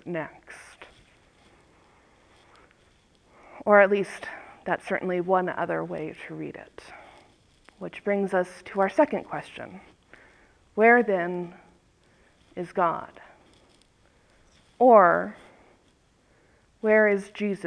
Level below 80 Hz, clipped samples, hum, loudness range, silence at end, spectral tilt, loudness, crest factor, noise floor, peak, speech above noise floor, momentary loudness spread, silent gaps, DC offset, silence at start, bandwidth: -66 dBFS; under 0.1%; none; 7 LU; 0 s; -7 dB/octave; -24 LUFS; 24 dB; -63 dBFS; -4 dBFS; 39 dB; 23 LU; none; under 0.1%; 0.05 s; 11 kHz